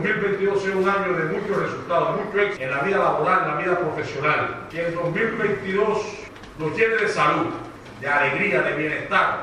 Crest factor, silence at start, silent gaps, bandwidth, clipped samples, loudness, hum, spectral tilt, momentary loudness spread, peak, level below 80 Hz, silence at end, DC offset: 18 dB; 0 s; none; 11 kHz; under 0.1%; -22 LUFS; none; -6 dB/octave; 8 LU; -4 dBFS; -54 dBFS; 0 s; under 0.1%